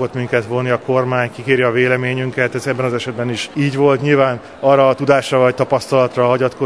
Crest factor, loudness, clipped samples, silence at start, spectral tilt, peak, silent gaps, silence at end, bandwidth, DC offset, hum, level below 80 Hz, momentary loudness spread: 14 dB; -16 LUFS; under 0.1%; 0 s; -6 dB/octave; 0 dBFS; none; 0 s; 11 kHz; 0.2%; none; -56 dBFS; 6 LU